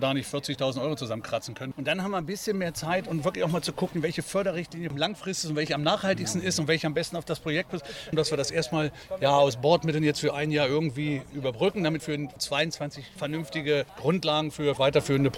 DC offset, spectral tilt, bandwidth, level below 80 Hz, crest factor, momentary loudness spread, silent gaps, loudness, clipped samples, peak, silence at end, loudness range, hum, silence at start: under 0.1%; -5 dB/octave; 16.5 kHz; -56 dBFS; 20 dB; 9 LU; none; -28 LUFS; under 0.1%; -8 dBFS; 0 s; 4 LU; none; 0 s